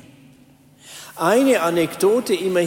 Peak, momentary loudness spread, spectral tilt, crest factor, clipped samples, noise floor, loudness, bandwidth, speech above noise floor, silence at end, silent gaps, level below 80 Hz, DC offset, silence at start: -6 dBFS; 21 LU; -4.5 dB/octave; 14 dB; under 0.1%; -51 dBFS; -18 LUFS; 16.5 kHz; 33 dB; 0 s; none; -62 dBFS; under 0.1%; 0.85 s